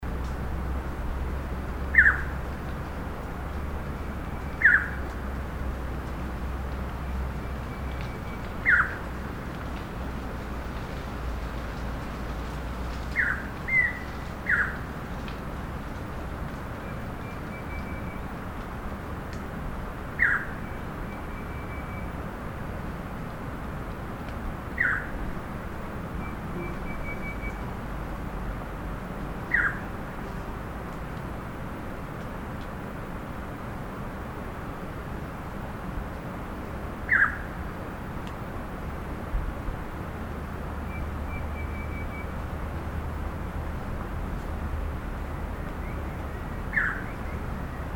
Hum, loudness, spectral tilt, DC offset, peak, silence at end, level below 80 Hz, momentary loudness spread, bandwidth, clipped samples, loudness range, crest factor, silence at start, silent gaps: none; -31 LUFS; -6.5 dB/octave; under 0.1%; -6 dBFS; 0 s; -36 dBFS; 12 LU; 17.5 kHz; under 0.1%; 8 LU; 26 dB; 0 s; none